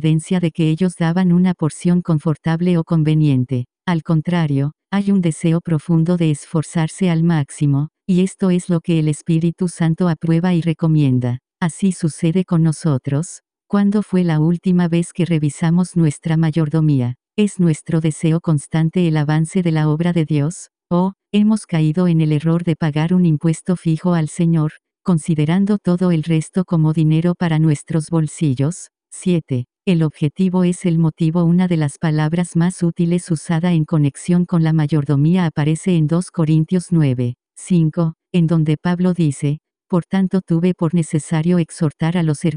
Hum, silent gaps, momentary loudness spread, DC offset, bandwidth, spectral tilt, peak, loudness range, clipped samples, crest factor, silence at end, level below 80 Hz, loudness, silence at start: none; none; 5 LU; under 0.1%; 10.5 kHz; -7.5 dB/octave; -4 dBFS; 1 LU; under 0.1%; 12 dB; 0 s; -50 dBFS; -17 LUFS; 0 s